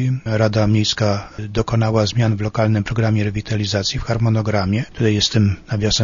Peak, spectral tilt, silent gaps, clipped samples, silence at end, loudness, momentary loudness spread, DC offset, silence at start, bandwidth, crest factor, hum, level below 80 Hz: -2 dBFS; -5.5 dB/octave; none; under 0.1%; 0 s; -18 LUFS; 5 LU; under 0.1%; 0 s; 7.4 kHz; 16 dB; none; -38 dBFS